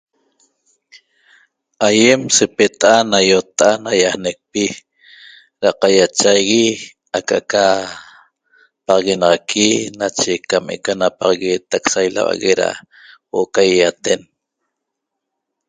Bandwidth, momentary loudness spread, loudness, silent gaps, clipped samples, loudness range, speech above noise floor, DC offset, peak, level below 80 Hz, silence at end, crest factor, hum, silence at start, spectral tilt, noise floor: 9.6 kHz; 10 LU; -15 LUFS; none; under 0.1%; 4 LU; 63 dB; under 0.1%; 0 dBFS; -56 dBFS; 1.5 s; 16 dB; none; 1.8 s; -2.5 dB/octave; -78 dBFS